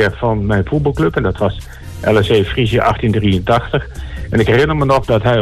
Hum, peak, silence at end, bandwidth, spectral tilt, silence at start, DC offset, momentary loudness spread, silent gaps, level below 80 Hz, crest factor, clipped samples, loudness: none; -2 dBFS; 0 s; 13.5 kHz; -7 dB/octave; 0 s; under 0.1%; 8 LU; none; -28 dBFS; 12 dB; under 0.1%; -15 LUFS